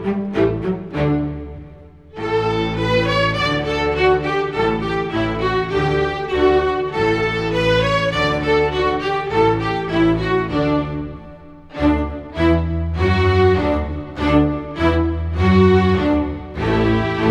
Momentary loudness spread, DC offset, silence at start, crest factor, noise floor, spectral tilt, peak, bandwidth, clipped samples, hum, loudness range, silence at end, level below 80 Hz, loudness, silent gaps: 8 LU; under 0.1%; 0 s; 16 dB; -40 dBFS; -7 dB/octave; -2 dBFS; 10 kHz; under 0.1%; none; 3 LU; 0 s; -32 dBFS; -18 LUFS; none